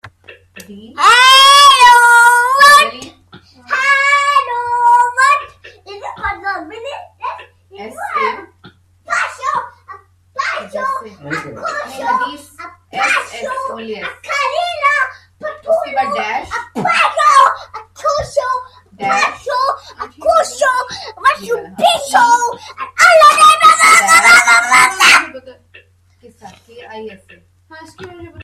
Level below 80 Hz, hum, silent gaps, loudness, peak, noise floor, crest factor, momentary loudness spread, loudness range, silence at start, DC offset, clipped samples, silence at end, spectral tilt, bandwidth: -50 dBFS; none; none; -10 LUFS; 0 dBFS; -46 dBFS; 14 dB; 21 LU; 15 LU; 0.05 s; under 0.1%; 0.1%; 0 s; 0 dB/octave; 16.5 kHz